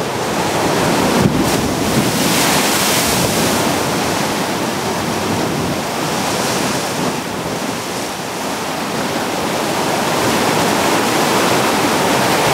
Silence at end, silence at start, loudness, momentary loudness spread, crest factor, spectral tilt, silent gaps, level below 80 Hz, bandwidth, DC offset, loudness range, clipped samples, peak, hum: 0 s; 0 s; -16 LUFS; 7 LU; 16 dB; -3.5 dB/octave; none; -42 dBFS; 16 kHz; under 0.1%; 5 LU; under 0.1%; 0 dBFS; none